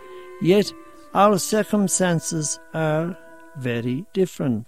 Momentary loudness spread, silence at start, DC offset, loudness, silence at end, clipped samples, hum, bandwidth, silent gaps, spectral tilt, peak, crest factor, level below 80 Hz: 13 LU; 0 s; 0.4%; -22 LUFS; 0.05 s; under 0.1%; none; 16 kHz; none; -5 dB/octave; -4 dBFS; 18 dB; -60 dBFS